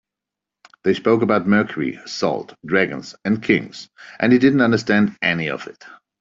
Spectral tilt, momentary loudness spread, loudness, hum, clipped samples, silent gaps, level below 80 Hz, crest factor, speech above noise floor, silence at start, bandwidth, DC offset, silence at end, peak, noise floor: -6.5 dB/octave; 13 LU; -19 LUFS; none; under 0.1%; none; -58 dBFS; 18 dB; 67 dB; 0.85 s; 7.6 kHz; under 0.1%; 0.3 s; -2 dBFS; -85 dBFS